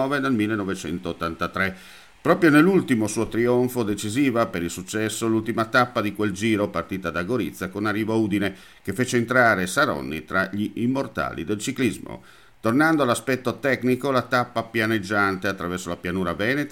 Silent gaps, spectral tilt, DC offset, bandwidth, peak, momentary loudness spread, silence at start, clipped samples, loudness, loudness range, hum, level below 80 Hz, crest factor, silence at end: none; -5.5 dB/octave; 0.1%; 17 kHz; -2 dBFS; 10 LU; 0 s; under 0.1%; -23 LUFS; 3 LU; none; -54 dBFS; 20 dB; 0 s